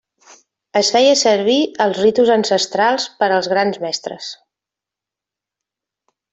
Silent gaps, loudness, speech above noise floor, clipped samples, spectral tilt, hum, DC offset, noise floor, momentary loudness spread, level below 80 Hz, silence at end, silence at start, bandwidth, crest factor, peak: none; -15 LUFS; 71 dB; under 0.1%; -3 dB/octave; none; under 0.1%; -86 dBFS; 11 LU; -62 dBFS; 2 s; 0.75 s; 8.4 kHz; 16 dB; -2 dBFS